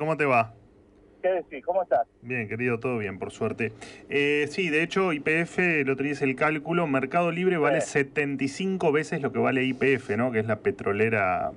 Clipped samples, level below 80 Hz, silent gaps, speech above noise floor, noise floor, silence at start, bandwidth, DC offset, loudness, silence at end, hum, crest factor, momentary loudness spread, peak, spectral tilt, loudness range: under 0.1%; -62 dBFS; none; 30 dB; -56 dBFS; 0 s; 11 kHz; under 0.1%; -26 LUFS; 0 s; none; 14 dB; 7 LU; -12 dBFS; -6 dB/octave; 4 LU